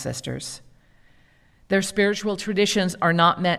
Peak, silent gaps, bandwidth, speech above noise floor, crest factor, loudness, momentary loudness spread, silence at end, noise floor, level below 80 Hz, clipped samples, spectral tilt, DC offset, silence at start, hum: -6 dBFS; none; 14.5 kHz; 35 dB; 18 dB; -22 LUFS; 14 LU; 0 s; -57 dBFS; -56 dBFS; under 0.1%; -4.5 dB/octave; under 0.1%; 0 s; none